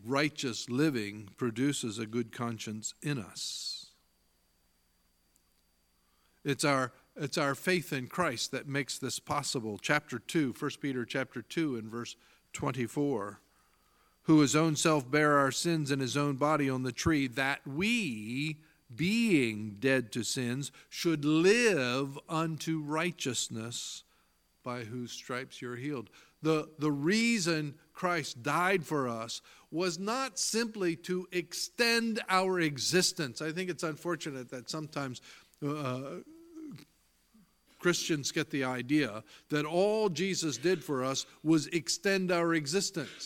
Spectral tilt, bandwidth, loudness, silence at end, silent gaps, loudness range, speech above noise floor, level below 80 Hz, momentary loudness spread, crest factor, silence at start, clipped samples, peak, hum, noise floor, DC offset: -4 dB/octave; 17 kHz; -32 LUFS; 0 s; none; 9 LU; 40 dB; -68 dBFS; 13 LU; 22 dB; 0 s; under 0.1%; -10 dBFS; none; -72 dBFS; under 0.1%